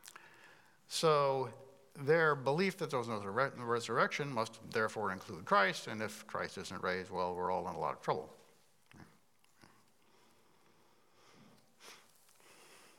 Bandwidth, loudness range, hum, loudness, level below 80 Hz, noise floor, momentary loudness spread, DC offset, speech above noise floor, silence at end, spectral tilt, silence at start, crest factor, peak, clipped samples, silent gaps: 16.5 kHz; 8 LU; none; -36 LUFS; -82 dBFS; -71 dBFS; 14 LU; under 0.1%; 36 dB; 0.2 s; -4.5 dB/octave; 0.05 s; 22 dB; -16 dBFS; under 0.1%; none